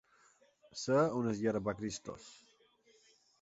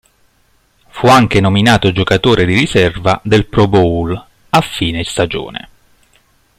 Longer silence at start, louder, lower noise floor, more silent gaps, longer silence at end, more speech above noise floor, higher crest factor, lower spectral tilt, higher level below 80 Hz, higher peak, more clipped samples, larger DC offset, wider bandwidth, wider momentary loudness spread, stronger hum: second, 0.75 s vs 0.95 s; second, -35 LUFS vs -12 LUFS; first, -69 dBFS vs -55 dBFS; neither; about the same, 1.05 s vs 1 s; second, 34 dB vs 43 dB; first, 20 dB vs 14 dB; about the same, -6 dB/octave vs -5.5 dB/octave; second, -68 dBFS vs -36 dBFS; second, -18 dBFS vs 0 dBFS; neither; neither; second, 8 kHz vs 15.5 kHz; first, 19 LU vs 12 LU; neither